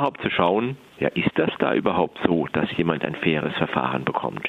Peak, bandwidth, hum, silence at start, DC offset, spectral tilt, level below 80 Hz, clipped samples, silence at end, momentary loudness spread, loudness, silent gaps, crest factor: -2 dBFS; 8.6 kHz; none; 0 s; under 0.1%; -8 dB/octave; -54 dBFS; under 0.1%; 0 s; 4 LU; -23 LUFS; none; 20 dB